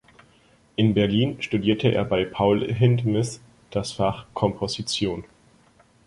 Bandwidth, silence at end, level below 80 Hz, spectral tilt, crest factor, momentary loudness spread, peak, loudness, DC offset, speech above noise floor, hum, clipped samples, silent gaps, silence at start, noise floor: 11.5 kHz; 0.85 s; -50 dBFS; -6 dB/octave; 18 dB; 10 LU; -4 dBFS; -23 LUFS; under 0.1%; 35 dB; none; under 0.1%; none; 0.8 s; -58 dBFS